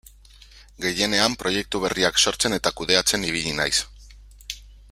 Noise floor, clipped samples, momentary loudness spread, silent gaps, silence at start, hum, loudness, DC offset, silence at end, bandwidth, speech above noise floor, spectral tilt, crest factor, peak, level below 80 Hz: -49 dBFS; under 0.1%; 18 LU; none; 0.55 s; 50 Hz at -45 dBFS; -21 LUFS; under 0.1%; 0.15 s; 16 kHz; 26 dB; -2 dB/octave; 24 dB; 0 dBFS; -46 dBFS